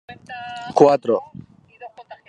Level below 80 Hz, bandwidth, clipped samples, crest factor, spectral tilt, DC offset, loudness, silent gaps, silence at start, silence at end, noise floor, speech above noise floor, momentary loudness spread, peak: -66 dBFS; 9.2 kHz; under 0.1%; 20 dB; -6.5 dB/octave; under 0.1%; -17 LUFS; none; 0.1 s; 0.15 s; -43 dBFS; 24 dB; 25 LU; 0 dBFS